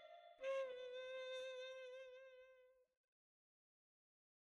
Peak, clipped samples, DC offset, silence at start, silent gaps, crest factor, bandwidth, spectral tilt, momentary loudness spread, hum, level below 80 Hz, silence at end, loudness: -38 dBFS; under 0.1%; under 0.1%; 0 s; none; 16 dB; 10.5 kHz; 0 dB/octave; 17 LU; none; under -90 dBFS; 1.85 s; -51 LUFS